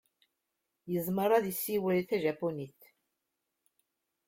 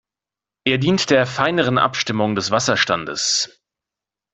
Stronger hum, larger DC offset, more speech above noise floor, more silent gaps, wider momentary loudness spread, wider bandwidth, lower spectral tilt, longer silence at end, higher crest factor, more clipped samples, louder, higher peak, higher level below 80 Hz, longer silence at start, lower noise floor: neither; neither; second, 54 dB vs 70 dB; neither; first, 9 LU vs 4 LU; first, 16.5 kHz vs 8.4 kHz; first, -5.5 dB/octave vs -3.5 dB/octave; first, 1.6 s vs 0.9 s; about the same, 20 dB vs 18 dB; neither; second, -32 LUFS vs -18 LUFS; second, -14 dBFS vs -2 dBFS; second, -74 dBFS vs -56 dBFS; first, 0.85 s vs 0.65 s; second, -85 dBFS vs -89 dBFS